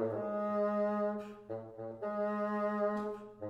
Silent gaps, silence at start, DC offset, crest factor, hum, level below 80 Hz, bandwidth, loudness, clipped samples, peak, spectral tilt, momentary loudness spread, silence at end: none; 0 s; under 0.1%; 14 dB; none; -74 dBFS; 7.8 kHz; -36 LUFS; under 0.1%; -22 dBFS; -8.5 dB/octave; 12 LU; 0 s